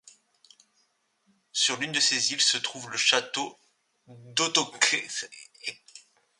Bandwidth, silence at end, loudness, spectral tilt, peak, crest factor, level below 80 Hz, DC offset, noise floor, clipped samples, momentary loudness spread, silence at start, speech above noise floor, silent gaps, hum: 11.5 kHz; 0.4 s; -25 LUFS; 0 dB/octave; -6 dBFS; 24 dB; -80 dBFS; under 0.1%; -71 dBFS; under 0.1%; 15 LU; 1.55 s; 43 dB; none; none